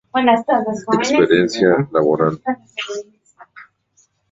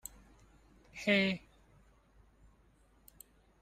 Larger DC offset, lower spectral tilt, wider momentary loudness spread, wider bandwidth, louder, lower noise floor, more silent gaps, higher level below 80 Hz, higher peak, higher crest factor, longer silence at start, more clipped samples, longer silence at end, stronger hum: neither; about the same, -5.5 dB/octave vs -4.5 dB/octave; second, 12 LU vs 29 LU; second, 8 kHz vs 15.5 kHz; first, -17 LUFS vs -32 LUFS; second, -60 dBFS vs -67 dBFS; neither; first, -56 dBFS vs -66 dBFS; first, -2 dBFS vs -18 dBFS; second, 16 dB vs 22 dB; second, 0.15 s vs 0.95 s; neither; second, 0.7 s vs 2.25 s; neither